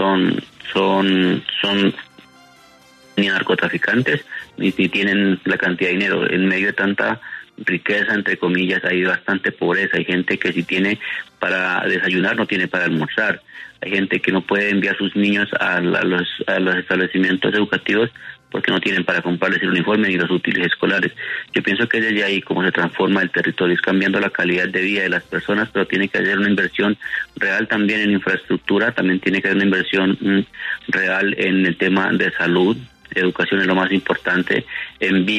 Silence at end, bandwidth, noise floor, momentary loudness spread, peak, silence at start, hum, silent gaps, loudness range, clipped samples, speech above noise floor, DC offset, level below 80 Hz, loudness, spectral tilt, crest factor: 0 s; 9.8 kHz; -48 dBFS; 5 LU; -2 dBFS; 0 s; none; none; 1 LU; under 0.1%; 30 dB; under 0.1%; -60 dBFS; -18 LUFS; -6.5 dB/octave; 16 dB